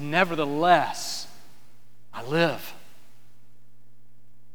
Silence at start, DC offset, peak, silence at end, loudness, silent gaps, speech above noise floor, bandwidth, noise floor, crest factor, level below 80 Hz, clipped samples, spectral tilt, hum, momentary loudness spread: 0 s; 2%; -4 dBFS; 1.8 s; -24 LUFS; none; 39 dB; over 20 kHz; -62 dBFS; 24 dB; -72 dBFS; under 0.1%; -4.5 dB/octave; 60 Hz at -65 dBFS; 21 LU